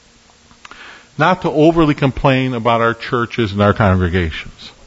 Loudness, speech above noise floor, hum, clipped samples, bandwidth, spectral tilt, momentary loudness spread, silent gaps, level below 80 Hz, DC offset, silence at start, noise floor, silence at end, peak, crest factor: -15 LUFS; 34 dB; none; under 0.1%; 8 kHz; -7.5 dB/octave; 12 LU; none; -36 dBFS; under 0.1%; 0.8 s; -48 dBFS; 0.15 s; 0 dBFS; 16 dB